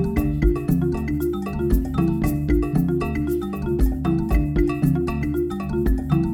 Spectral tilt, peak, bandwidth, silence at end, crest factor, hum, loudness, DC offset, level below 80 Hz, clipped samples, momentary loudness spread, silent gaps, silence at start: -8.5 dB/octave; -6 dBFS; 17.5 kHz; 0 s; 14 dB; none; -22 LUFS; under 0.1%; -26 dBFS; under 0.1%; 4 LU; none; 0 s